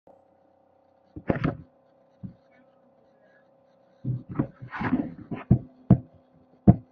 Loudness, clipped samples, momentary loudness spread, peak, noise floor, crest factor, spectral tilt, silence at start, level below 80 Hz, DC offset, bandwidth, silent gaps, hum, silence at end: -27 LUFS; under 0.1%; 23 LU; -2 dBFS; -62 dBFS; 28 dB; -11.5 dB/octave; 1.15 s; -46 dBFS; under 0.1%; 4.9 kHz; none; none; 0.1 s